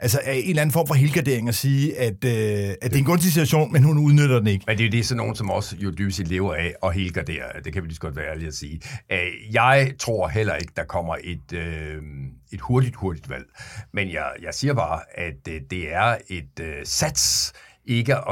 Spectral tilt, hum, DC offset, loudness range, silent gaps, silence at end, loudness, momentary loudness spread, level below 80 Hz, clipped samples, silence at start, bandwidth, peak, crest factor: -5 dB/octave; none; under 0.1%; 8 LU; none; 0 s; -22 LUFS; 15 LU; -44 dBFS; under 0.1%; 0 s; 17 kHz; -2 dBFS; 20 dB